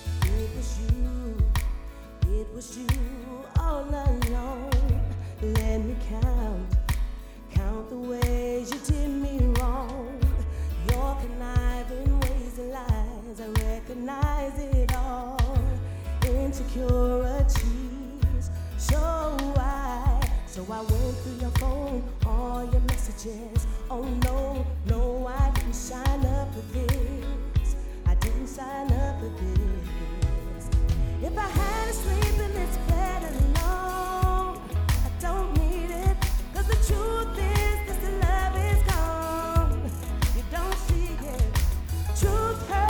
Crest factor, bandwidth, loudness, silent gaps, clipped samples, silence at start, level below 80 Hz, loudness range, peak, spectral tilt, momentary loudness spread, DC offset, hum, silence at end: 16 dB; over 20 kHz; -28 LUFS; none; under 0.1%; 0 s; -28 dBFS; 3 LU; -10 dBFS; -6 dB/octave; 7 LU; under 0.1%; none; 0 s